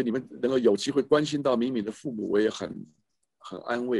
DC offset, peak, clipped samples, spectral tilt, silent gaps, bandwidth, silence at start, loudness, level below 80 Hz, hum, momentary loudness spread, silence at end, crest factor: under 0.1%; -8 dBFS; under 0.1%; -5.5 dB/octave; none; 11.5 kHz; 0 s; -27 LUFS; -68 dBFS; none; 14 LU; 0 s; 20 dB